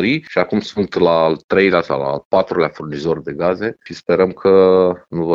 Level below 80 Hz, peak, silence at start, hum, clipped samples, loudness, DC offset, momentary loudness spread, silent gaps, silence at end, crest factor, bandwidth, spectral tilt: -50 dBFS; 0 dBFS; 0 s; none; under 0.1%; -16 LUFS; under 0.1%; 9 LU; 1.44-1.49 s, 2.25-2.31 s; 0 s; 14 dB; 7.4 kHz; -7 dB/octave